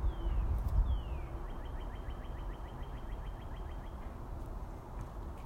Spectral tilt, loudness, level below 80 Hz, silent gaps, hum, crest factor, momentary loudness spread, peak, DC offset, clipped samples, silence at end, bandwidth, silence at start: -7.5 dB/octave; -42 LUFS; -38 dBFS; none; none; 18 dB; 11 LU; -20 dBFS; under 0.1%; under 0.1%; 0 s; 7.2 kHz; 0 s